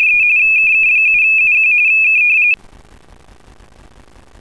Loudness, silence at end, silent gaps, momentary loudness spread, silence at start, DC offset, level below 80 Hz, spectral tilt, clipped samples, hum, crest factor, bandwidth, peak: -8 LUFS; 1.85 s; none; 2 LU; 0 s; 0.3%; -48 dBFS; -1.5 dB/octave; under 0.1%; none; 6 dB; 11 kHz; -6 dBFS